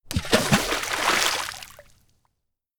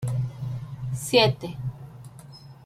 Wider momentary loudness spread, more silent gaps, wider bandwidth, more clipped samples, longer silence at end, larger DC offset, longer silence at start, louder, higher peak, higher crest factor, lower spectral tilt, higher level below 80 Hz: second, 15 LU vs 25 LU; neither; first, over 20 kHz vs 15 kHz; neither; first, 1 s vs 0 s; neither; about the same, 0.05 s vs 0 s; first, -22 LUFS vs -26 LUFS; about the same, -4 dBFS vs -6 dBFS; about the same, 22 dB vs 20 dB; second, -3 dB/octave vs -5 dB/octave; first, -44 dBFS vs -52 dBFS